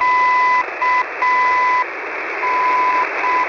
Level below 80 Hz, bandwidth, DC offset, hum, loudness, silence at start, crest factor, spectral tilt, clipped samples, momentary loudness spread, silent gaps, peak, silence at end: -60 dBFS; 6 kHz; under 0.1%; none; -16 LUFS; 0 s; 10 dB; -2.5 dB/octave; under 0.1%; 7 LU; none; -6 dBFS; 0 s